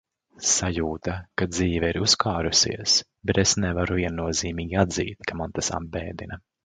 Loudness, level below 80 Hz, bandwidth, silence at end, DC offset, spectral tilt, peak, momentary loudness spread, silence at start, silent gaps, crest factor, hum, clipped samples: -24 LUFS; -40 dBFS; 11 kHz; 0.25 s; under 0.1%; -3 dB/octave; -4 dBFS; 11 LU; 0.4 s; none; 22 dB; none; under 0.1%